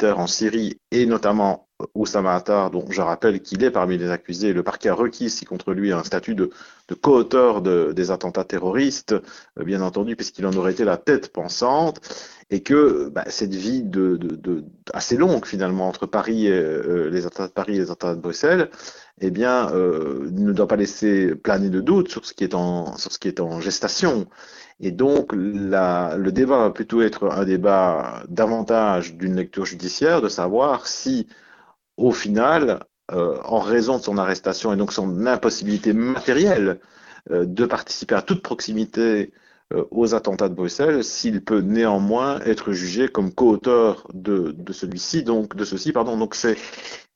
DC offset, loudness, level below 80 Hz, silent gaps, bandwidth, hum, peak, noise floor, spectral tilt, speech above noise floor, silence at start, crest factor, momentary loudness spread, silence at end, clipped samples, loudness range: under 0.1%; -21 LUFS; -54 dBFS; none; 7.6 kHz; none; 0 dBFS; -53 dBFS; -5 dB/octave; 32 dB; 0 s; 20 dB; 9 LU; 0.15 s; under 0.1%; 3 LU